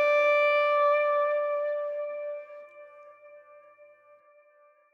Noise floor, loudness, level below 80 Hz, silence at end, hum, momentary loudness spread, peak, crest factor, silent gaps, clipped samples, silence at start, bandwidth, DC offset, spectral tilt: -61 dBFS; -26 LUFS; under -90 dBFS; 1.55 s; none; 17 LU; -14 dBFS; 14 dB; none; under 0.1%; 0 s; 6.2 kHz; under 0.1%; 0 dB/octave